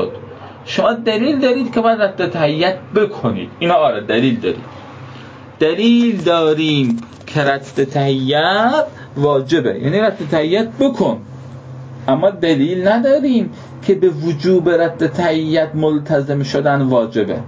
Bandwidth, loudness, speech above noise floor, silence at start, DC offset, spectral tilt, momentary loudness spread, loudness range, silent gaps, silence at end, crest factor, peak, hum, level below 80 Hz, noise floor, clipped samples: 7.8 kHz; -15 LUFS; 20 dB; 0 s; under 0.1%; -7 dB/octave; 12 LU; 2 LU; none; 0 s; 14 dB; -2 dBFS; none; -52 dBFS; -35 dBFS; under 0.1%